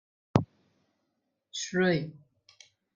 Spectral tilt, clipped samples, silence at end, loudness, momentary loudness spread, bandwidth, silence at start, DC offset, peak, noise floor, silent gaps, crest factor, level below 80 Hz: -5.5 dB/octave; under 0.1%; 0.85 s; -30 LUFS; 16 LU; 7.6 kHz; 0.35 s; under 0.1%; -4 dBFS; -80 dBFS; none; 28 dB; -64 dBFS